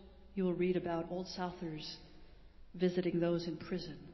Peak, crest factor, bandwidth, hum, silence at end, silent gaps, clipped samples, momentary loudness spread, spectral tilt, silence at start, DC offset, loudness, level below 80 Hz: -22 dBFS; 16 dB; 6.2 kHz; none; 0 s; none; under 0.1%; 12 LU; -7 dB/octave; 0 s; under 0.1%; -38 LUFS; -62 dBFS